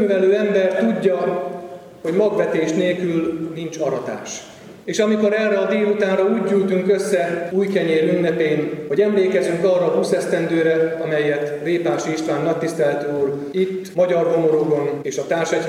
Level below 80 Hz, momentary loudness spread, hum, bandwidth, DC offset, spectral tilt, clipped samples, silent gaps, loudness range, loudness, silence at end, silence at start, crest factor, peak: -64 dBFS; 8 LU; none; 13.5 kHz; under 0.1%; -6 dB/octave; under 0.1%; none; 3 LU; -19 LUFS; 0 s; 0 s; 14 dB; -4 dBFS